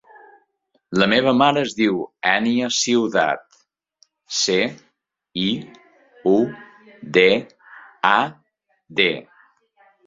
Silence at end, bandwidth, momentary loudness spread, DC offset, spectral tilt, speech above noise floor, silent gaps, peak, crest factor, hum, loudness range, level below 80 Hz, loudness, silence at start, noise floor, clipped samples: 0.85 s; 7.8 kHz; 11 LU; under 0.1%; -3.5 dB/octave; 49 dB; none; -2 dBFS; 20 dB; none; 5 LU; -62 dBFS; -19 LUFS; 0.9 s; -67 dBFS; under 0.1%